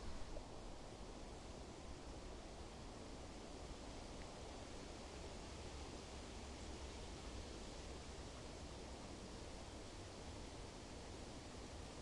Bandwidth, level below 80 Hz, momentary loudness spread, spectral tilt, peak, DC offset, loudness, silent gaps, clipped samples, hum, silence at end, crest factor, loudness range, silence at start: 11.5 kHz; -58 dBFS; 2 LU; -4.5 dB/octave; -36 dBFS; under 0.1%; -54 LUFS; none; under 0.1%; none; 0 s; 16 dB; 2 LU; 0 s